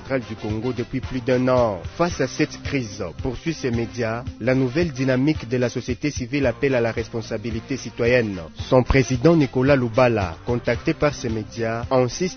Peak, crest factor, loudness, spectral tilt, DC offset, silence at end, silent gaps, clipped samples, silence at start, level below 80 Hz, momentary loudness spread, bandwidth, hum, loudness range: -2 dBFS; 20 dB; -22 LUFS; -6.5 dB/octave; under 0.1%; 0 s; none; under 0.1%; 0 s; -38 dBFS; 10 LU; 6.6 kHz; none; 4 LU